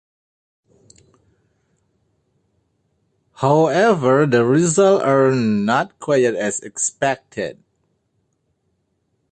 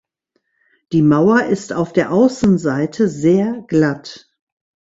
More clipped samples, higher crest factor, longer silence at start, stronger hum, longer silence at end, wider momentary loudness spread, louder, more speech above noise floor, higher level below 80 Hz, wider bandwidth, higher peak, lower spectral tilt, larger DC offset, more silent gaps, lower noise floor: neither; about the same, 16 dB vs 16 dB; first, 3.4 s vs 0.9 s; neither; first, 1.8 s vs 0.7 s; about the same, 9 LU vs 7 LU; about the same, -17 LUFS vs -16 LUFS; about the same, 52 dB vs 54 dB; second, -62 dBFS vs -50 dBFS; first, 9.8 kHz vs 8 kHz; about the same, -2 dBFS vs -2 dBFS; second, -5 dB/octave vs -7 dB/octave; neither; neither; about the same, -69 dBFS vs -69 dBFS